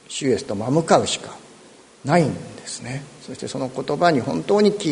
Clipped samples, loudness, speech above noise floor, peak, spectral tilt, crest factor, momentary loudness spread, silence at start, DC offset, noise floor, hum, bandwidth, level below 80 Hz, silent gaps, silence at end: under 0.1%; -21 LUFS; 27 dB; 0 dBFS; -5 dB/octave; 22 dB; 16 LU; 0.1 s; under 0.1%; -48 dBFS; none; 11 kHz; -58 dBFS; none; 0 s